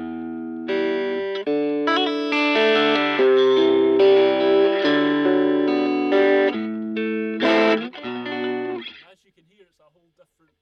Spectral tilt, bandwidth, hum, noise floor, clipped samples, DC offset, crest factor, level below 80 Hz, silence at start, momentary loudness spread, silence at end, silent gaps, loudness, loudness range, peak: -5.5 dB/octave; 6.4 kHz; none; -62 dBFS; under 0.1%; under 0.1%; 14 dB; -66 dBFS; 0 s; 13 LU; 1.65 s; none; -19 LUFS; 7 LU; -6 dBFS